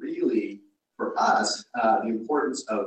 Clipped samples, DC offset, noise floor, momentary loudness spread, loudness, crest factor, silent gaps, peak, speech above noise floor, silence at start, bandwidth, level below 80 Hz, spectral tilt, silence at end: under 0.1%; under 0.1%; -46 dBFS; 8 LU; -25 LUFS; 16 dB; none; -10 dBFS; 21 dB; 0 s; 9.2 kHz; -72 dBFS; -3.5 dB/octave; 0 s